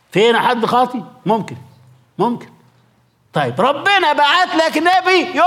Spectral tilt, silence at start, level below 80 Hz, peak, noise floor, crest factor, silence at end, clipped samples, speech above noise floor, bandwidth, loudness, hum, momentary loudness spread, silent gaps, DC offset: -4.5 dB/octave; 0.15 s; -66 dBFS; -2 dBFS; -56 dBFS; 12 dB; 0 s; under 0.1%; 41 dB; 16 kHz; -15 LUFS; none; 8 LU; none; under 0.1%